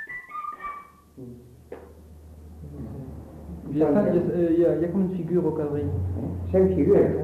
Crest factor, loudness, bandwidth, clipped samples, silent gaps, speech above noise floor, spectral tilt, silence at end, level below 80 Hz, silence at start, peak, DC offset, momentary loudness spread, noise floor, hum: 16 dB; -24 LUFS; 13 kHz; under 0.1%; none; 24 dB; -10.5 dB/octave; 0 s; -46 dBFS; 0 s; -8 dBFS; under 0.1%; 23 LU; -46 dBFS; none